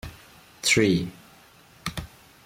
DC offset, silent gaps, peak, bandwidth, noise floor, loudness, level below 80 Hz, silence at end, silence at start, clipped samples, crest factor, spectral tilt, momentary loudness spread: under 0.1%; none; -8 dBFS; 16.5 kHz; -53 dBFS; -24 LUFS; -50 dBFS; 0.4 s; 0.05 s; under 0.1%; 20 dB; -3.5 dB/octave; 21 LU